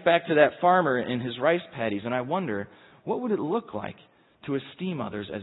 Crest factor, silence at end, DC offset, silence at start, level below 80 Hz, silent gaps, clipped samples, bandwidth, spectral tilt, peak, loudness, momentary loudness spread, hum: 20 dB; 0 s; under 0.1%; 0 s; -68 dBFS; none; under 0.1%; 4.1 kHz; -10.5 dB/octave; -6 dBFS; -26 LUFS; 16 LU; none